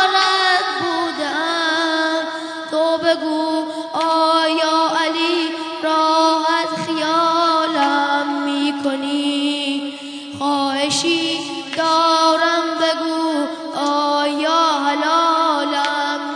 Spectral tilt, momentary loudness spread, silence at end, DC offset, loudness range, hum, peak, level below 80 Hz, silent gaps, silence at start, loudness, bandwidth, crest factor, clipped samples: -2.5 dB/octave; 8 LU; 0 s; under 0.1%; 3 LU; none; 0 dBFS; -74 dBFS; none; 0 s; -17 LUFS; 10 kHz; 18 dB; under 0.1%